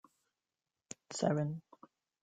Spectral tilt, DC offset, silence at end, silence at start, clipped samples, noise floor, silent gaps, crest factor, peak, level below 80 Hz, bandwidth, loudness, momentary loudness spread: -6 dB/octave; under 0.1%; 0.6 s; 1.1 s; under 0.1%; under -90 dBFS; none; 22 dB; -18 dBFS; -78 dBFS; 9.4 kHz; -37 LUFS; 18 LU